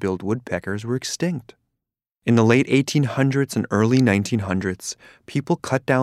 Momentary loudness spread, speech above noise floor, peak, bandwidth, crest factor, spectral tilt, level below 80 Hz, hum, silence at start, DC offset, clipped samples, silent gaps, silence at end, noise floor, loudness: 12 LU; 63 dB; -2 dBFS; 14.5 kHz; 18 dB; -6 dB/octave; -60 dBFS; none; 0 s; under 0.1%; under 0.1%; none; 0 s; -83 dBFS; -21 LUFS